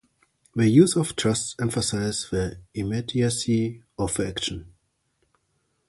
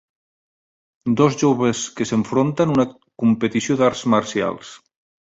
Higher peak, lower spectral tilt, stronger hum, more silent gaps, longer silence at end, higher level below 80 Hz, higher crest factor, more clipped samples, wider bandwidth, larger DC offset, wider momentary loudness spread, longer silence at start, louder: about the same, -4 dBFS vs -4 dBFS; about the same, -5 dB/octave vs -5.5 dB/octave; neither; neither; first, 1.2 s vs 0.55 s; first, -48 dBFS vs -56 dBFS; first, 22 dB vs 16 dB; neither; first, 12 kHz vs 8 kHz; neither; first, 13 LU vs 8 LU; second, 0.55 s vs 1.05 s; second, -24 LUFS vs -19 LUFS